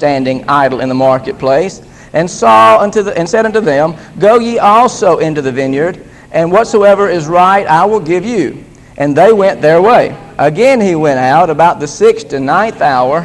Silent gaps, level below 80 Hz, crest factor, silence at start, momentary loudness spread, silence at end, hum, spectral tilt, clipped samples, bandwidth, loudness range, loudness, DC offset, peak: none; -44 dBFS; 10 dB; 0 s; 8 LU; 0 s; none; -5.5 dB/octave; 0.9%; 12 kHz; 2 LU; -9 LUFS; under 0.1%; 0 dBFS